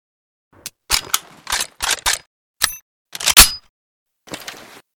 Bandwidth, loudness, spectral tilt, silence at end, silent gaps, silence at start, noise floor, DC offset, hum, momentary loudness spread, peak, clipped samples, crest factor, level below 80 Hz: over 20 kHz; -15 LUFS; 0.5 dB/octave; 0.4 s; 2.27-2.54 s, 2.82-3.05 s, 3.69-4.06 s; 0.65 s; -38 dBFS; under 0.1%; none; 27 LU; 0 dBFS; 0.3%; 20 dB; -36 dBFS